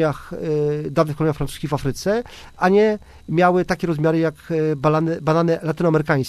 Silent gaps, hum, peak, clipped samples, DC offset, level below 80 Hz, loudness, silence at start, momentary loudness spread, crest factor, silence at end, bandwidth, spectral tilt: none; none; -4 dBFS; under 0.1%; under 0.1%; -46 dBFS; -20 LUFS; 0 s; 7 LU; 16 dB; 0 s; 14 kHz; -7 dB/octave